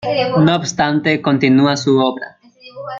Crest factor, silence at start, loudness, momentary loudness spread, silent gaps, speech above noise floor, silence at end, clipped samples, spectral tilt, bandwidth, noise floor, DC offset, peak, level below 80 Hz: 14 dB; 0 s; -14 LUFS; 14 LU; none; 22 dB; 0 s; under 0.1%; -5.5 dB/octave; 7.6 kHz; -36 dBFS; under 0.1%; -2 dBFS; -54 dBFS